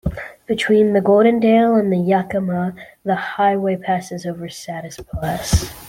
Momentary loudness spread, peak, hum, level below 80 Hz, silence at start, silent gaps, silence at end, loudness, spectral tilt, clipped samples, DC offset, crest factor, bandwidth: 16 LU; -2 dBFS; none; -36 dBFS; 0.05 s; none; 0 s; -18 LUFS; -6 dB/octave; under 0.1%; under 0.1%; 14 dB; 16.5 kHz